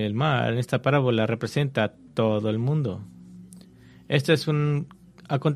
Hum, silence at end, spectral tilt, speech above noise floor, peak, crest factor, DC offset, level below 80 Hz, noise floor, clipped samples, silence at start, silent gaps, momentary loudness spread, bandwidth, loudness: none; 0 s; -7 dB/octave; 26 dB; -6 dBFS; 18 dB; under 0.1%; -62 dBFS; -50 dBFS; under 0.1%; 0 s; none; 8 LU; 13.5 kHz; -25 LUFS